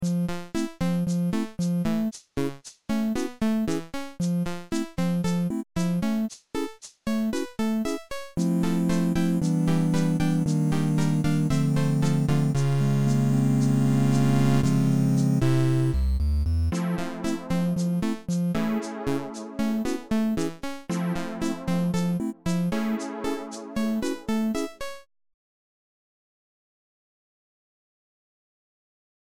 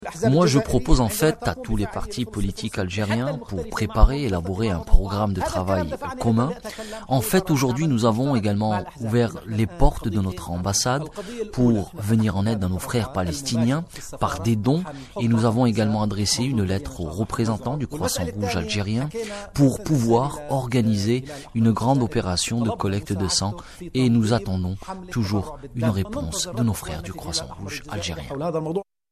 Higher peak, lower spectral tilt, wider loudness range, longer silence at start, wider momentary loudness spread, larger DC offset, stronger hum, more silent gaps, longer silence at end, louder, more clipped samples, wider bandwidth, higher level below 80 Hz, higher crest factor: second, -10 dBFS vs -2 dBFS; first, -7 dB/octave vs -5.5 dB/octave; first, 7 LU vs 3 LU; about the same, 0 s vs 0 s; about the same, 9 LU vs 9 LU; first, 1% vs under 0.1%; neither; neither; first, 3.9 s vs 0.3 s; second, -26 LUFS vs -23 LUFS; neither; first, 18 kHz vs 13.5 kHz; second, -40 dBFS vs -32 dBFS; second, 14 dB vs 22 dB